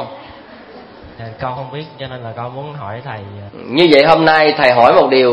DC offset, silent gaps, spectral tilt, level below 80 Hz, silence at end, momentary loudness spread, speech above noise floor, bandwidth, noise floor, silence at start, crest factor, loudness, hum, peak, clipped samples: under 0.1%; none; -6.5 dB/octave; -50 dBFS; 0 s; 22 LU; 23 dB; 11 kHz; -37 dBFS; 0 s; 14 dB; -10 LUFS; none; 0 dBFS; 0.1%